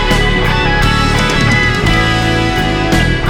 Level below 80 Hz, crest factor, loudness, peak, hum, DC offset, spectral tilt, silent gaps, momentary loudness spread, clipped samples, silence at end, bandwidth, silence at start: -18 dBFS; 10 dB; -11 LUFS; -2 dBFS; none; under 0.1%; -5 dB/octave; none; 2 LU; under 0.1%; 0 s; 17.5 kHz; 0 s